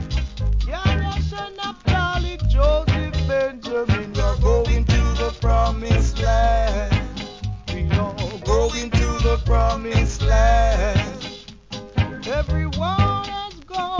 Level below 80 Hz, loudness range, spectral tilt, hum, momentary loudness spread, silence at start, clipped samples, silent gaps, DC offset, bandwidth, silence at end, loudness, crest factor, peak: -22 dBFS; 2 LU; -6 dB/octave; none; 10 LU; 0 s; under 0.1%; none; under 0.1%; 7.6 kHz; 0 s; -21 LUFS; 14 dB; -4 dBFS